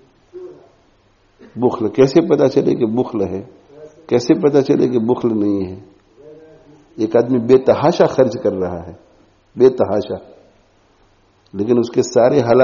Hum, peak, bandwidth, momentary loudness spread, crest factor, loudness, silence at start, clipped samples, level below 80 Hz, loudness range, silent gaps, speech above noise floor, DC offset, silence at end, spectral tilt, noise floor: none; 0 dBFS; 7.2 kHz; 17 LU; 16 dB; -15 LUFS; 0.35 s; under 0.1%; -54 dBFS; 4 LU; none; 40 dB; under 0.1%; 0 s; -7 dB/octave; -55 dBFS